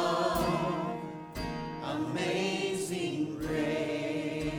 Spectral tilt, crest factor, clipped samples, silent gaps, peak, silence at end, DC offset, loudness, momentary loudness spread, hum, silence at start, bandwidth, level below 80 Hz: -5 dB/octave; 16 dB; under 0.1%; none; -16 dBFS; 0 s; under 0.1%; -33 LUFS; 8 LU; none; 0 s; over 20 kHz; -52 dBFS